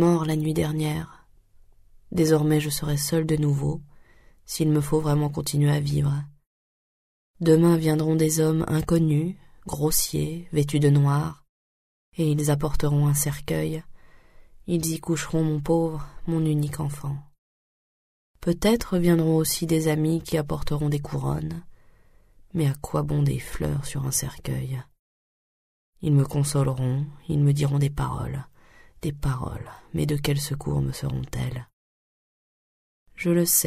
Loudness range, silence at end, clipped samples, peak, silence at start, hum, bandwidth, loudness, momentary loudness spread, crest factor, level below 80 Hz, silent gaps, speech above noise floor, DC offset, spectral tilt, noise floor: 6 LU; 0 s; under 0.1%; -6 dBFS; 0 s; none; 15.5 kHz; -25 LUFS; 12 LU; 18 dB; -42 dBFS; 6.47-7.34 s, 11.49-12.12 s, 17.38-18.34 s, 24.99-25.93 s, 31.73-33.06 s; 31 dB; under 0.1%; -6 dB/octave; -54 dBFS